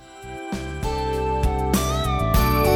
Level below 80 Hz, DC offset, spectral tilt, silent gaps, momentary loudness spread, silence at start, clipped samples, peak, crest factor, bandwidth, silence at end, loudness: -26 dBFS; under 0.1%; -5.5 dB/octave; none; 12 LU; 0 s; under 0.1%; -6 dBFS; 16 dB; over 20 kHz; 0 s; -23 LUFS